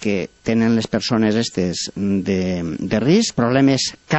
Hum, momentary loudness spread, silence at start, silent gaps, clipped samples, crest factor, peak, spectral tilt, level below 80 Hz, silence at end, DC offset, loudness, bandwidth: none; 7 LU; 0 s; none; under 0.1%; 14 dB; -4 dBFS; -5 dB/octave; -48 dBFS; 0 s; under 0.1%; -19 LUFS; 8.4 kHz